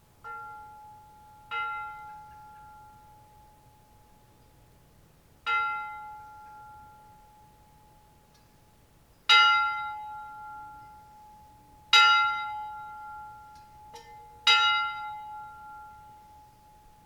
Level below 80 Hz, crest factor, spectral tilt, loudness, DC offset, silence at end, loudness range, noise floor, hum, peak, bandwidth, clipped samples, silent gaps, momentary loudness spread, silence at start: -64 dBFS; 26 dB; 1 dB/octave; -24 LUFS; under 0.1%; 1.1 s; 16 LU; -60 dBFS; none; -6 dBFS; 18.5 kHz; under 0.1%; none; 30 LU; 0.25 s